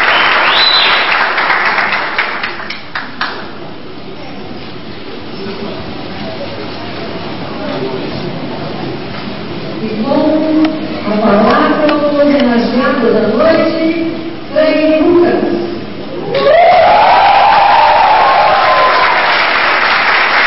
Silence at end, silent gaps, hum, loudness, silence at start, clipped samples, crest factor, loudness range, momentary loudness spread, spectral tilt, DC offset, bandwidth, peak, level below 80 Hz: 0 s; none; none; -10 LUFS; 0 s; under 0.1%; 12 dB; 16 LU; 17 LU; -8 dB/octave; 4%; 5.8 kHz; 0 dBFS; -42 dBFS